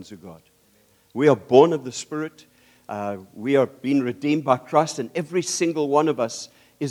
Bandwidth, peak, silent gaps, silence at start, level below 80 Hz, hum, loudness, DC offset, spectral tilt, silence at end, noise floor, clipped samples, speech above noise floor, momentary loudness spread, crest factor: 16 kHz; -2 dBFS; none; 0 s; -72 dBFS; none; -22 LUFS; under 0.1%; -5 dB/octave; 0 s; -60 dBFS; under 0.1%; 38 dB; 18 LU; 22 dB